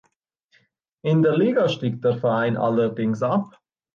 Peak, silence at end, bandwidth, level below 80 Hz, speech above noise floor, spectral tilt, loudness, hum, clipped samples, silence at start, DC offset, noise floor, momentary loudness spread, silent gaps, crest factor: -8 dBFS; 0.45 s; 7.2 kHz; -66 dBFS; 48 dB; -8 dB/octave; -22 LUFS; none; under 0.1%; 1.05 s; under 0.1%; -68 dBFS; 6 LU; none; 14 dB